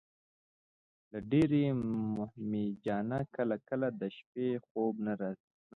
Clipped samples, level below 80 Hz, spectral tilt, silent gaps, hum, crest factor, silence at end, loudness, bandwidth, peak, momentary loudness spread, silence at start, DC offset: under 0.1%; -66 dBFS; -7.5 dB/octave; 4.26-4.33 s, 4.71-4.75 s; none; 18 dB; 0.4 s; -35 LUFS; 7.6 kHz; -18 dBFS; 12 LU; 1.15 s; under 0.1%